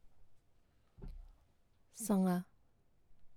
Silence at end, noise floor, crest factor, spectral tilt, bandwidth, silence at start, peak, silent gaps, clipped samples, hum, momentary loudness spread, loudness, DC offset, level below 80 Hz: 0 s; -70 dBFS; 20 dB; -6.5 dB/octave; 16.5 kHz; 0.05 s; -22 dBFS; none; under 0.1%; none; 24 LU; -36 LUFS; under 0.1%; -60 dBFS